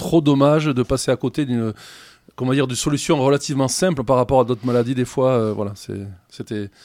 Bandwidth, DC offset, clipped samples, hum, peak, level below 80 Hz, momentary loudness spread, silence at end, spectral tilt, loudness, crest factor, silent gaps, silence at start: 16 kHz; under 0.1%; under 0.1%; none; -4 dBFS; -46 dBFS; 14 LU; 0.15 s; -5.5 dB/octave; -19 LUFS; 16 dB; none; 0 s